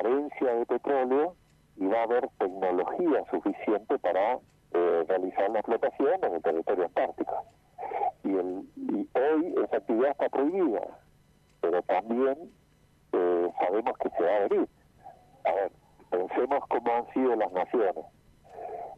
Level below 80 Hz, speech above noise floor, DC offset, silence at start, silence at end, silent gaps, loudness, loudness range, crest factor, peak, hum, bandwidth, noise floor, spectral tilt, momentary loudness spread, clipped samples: -68 dBFS; 35 dB; under 0.1%; 0 s; 0 s; none; -29 LUFS; 2 LU; 14 dB; -16 dBFS; none; 5.4 kHz; -63 dBFS; -7.5 dB/octave; 8 LU; under 0.1%